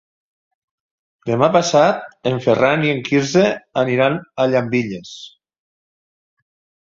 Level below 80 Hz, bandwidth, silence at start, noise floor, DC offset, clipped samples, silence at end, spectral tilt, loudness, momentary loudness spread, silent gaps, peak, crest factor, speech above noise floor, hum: -58 dBFS; 7.6 kHz; 1.25 s; under -90 dBFS; under 0.1%; under 0.1%; 1.6 s; -5.5 dB/octave; -17 LUFS; 12 LU; none; 0 dBFS; 18 dB; over 73 dB; none